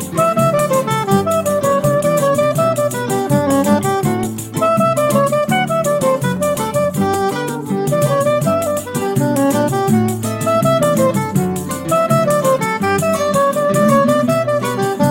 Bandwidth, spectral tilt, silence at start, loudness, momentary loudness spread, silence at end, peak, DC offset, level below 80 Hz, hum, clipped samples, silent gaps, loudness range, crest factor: 16.5 kHz; -5.5 dB/octave; 0 s; -15 LUFS; 5 LU; 0 s; 0 dBFS; under 0.1%; -48 dBFS; none; under 0.1%; none; 2 LU; 14 dB